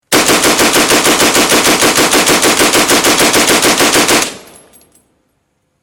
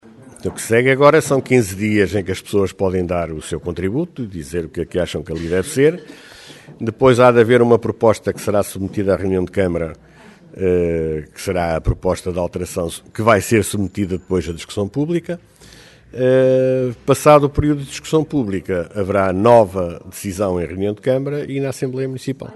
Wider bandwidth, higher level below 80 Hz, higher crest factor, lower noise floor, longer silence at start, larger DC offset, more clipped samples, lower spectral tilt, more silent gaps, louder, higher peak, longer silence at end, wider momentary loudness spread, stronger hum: first, 19 kHz vs 12.5 kHz; about the same, -40 dBFS vs -40 dBFS; second, 10 dB vs 18 dB; first, -62 dBFS vs -43 dBFS; about the same, 0.1 s vs 0.05 s; neither; neither; second, -1.5 dB/octave vs -6 dB/octave; neither; first, -8 LUFS vs -17 LUFS; about the same, 0 dBFS vs 0 dBFS; first, 1.4 s vs 0 s; second, 1 LU vs 13 LU; neither